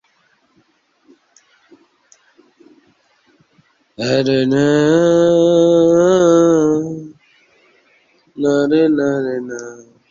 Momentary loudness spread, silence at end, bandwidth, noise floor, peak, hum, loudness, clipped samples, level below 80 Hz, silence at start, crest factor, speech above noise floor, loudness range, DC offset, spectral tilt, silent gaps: 14 LU; 0.3 s; 7.6 kHz; -59 dBFS; -2 dBFS; none; -14 LUFS; under 0.1%; -56 dBFS; 4 s; 14 dB; 46 dB; 8 LU; under 0.1%; -6 dB/octave; none